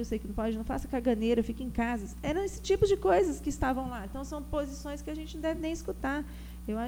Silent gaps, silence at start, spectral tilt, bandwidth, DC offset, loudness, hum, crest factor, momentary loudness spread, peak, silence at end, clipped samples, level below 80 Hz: none; 0 s; -6 dB/octave; over 20 kHz; under 0.1%; -32 LUFS; none; 18 dB; 12 LU; -14 dBFS; 0 s; under 0.1%; -42 dBFS